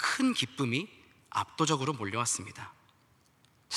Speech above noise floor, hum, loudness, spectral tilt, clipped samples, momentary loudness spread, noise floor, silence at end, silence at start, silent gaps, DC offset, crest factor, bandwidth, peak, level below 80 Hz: 34 dB; none; -31 LUFS; -3.5 dB/octave; under 0.1%; 16 LU; -66 dBFS; 0 s; 0 s; none; under 0.1%; 20 dB; 14 kHz; -14 dBFS; -76 dBFS